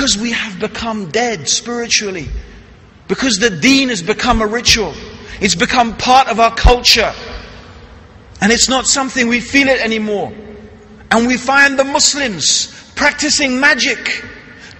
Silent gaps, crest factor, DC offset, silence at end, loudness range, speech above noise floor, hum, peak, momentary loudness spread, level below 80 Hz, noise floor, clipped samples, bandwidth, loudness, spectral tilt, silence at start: none; 14 dB; under 0.1%; 0.05 s; 3 LU; 27 dB; none; 0 dBFS; 13 LU; -28 dBFS; -40 dBFS; under 0.1%; 16.5 kHz; -13 LUFS; -2.5 dB/octave; 0 s